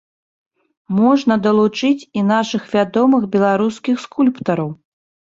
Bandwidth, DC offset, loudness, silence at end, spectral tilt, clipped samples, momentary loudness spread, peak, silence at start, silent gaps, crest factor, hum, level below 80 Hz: 7.8 kHz; under 0.1%; -16 LUFS; 0.45 s; -6.5 dB/octave; under 0.1%; 7 LU; -2 dBFS; 0.9 s; none; 14 dB; none; -60 dBFS